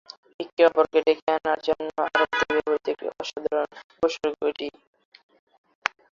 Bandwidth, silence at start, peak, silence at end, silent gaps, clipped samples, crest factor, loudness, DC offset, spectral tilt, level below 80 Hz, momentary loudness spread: 7.4 kHz; 0.4 s; 0 dBFS; 1.45 s; 0.53-0.57 s, 1.22-1.27 s, 3.84-3.90 s; under 0.1%; 26 dB; -25 LUFS; under 0.1%; -3.5 dB/octave; -62 dBFS; 13 LU